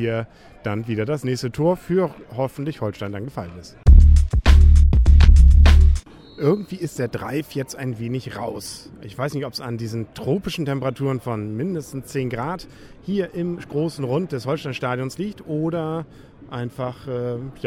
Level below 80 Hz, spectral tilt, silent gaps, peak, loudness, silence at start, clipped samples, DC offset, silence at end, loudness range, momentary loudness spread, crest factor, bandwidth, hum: -20 dBFS; -7 dB/octave; none; -2 dBFS; -21 LUFS; 0 s; under 0.1%; under 0.1%; 0 s; 12 LU; 17 LU; 16 dB; 11.5 kHz; none